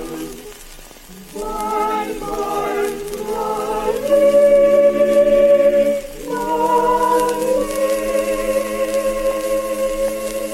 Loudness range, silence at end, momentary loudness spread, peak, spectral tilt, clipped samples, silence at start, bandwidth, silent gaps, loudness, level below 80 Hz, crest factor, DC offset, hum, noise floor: 9 LU; 0 s; 14 LU; -4 dBFS; -4 dB/octave; under 0.1%; 0 s; 16.5 kHz; none; -17 LUFS; -40 dBFS; 12 dB; under 0.1%; none; -38 dBFS